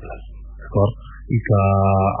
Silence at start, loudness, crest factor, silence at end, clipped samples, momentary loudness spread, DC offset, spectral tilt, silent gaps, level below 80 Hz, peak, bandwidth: 0 s; -19 LUFS; 14 dB; 0 s; under 0.1%; 22 LU; under 0.1%; -13 dB/octave; none; -36 dBFS; -6 dBFS; 3.3 kHz